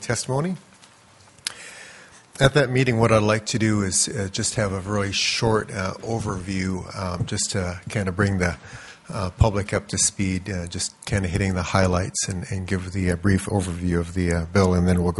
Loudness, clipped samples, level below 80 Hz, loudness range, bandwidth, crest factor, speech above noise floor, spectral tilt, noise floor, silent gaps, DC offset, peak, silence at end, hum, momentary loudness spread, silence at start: -23 LUFS; under 0.1%; -42 dBFS; 4 LU; 11.5 kHz; 22 dB; 29 dB; -4.5 dB/octave; -52 dBFS; none; under 0.1%; 0 dBFS; 0 s; none; 11 LU; 0 s